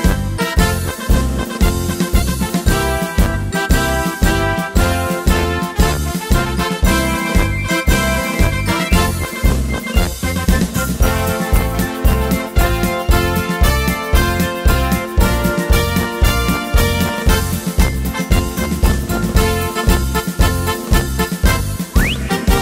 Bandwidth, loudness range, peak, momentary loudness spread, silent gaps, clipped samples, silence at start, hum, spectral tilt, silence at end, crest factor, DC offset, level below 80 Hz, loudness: 16.5 kHz; 1 LU; 0 dBFS; 3 LU; none; under 0.1%; 0 s; none; -5 dB/octave; 0 s; 14 dB; under 0.1%; -18 dBFS; -16 LUFS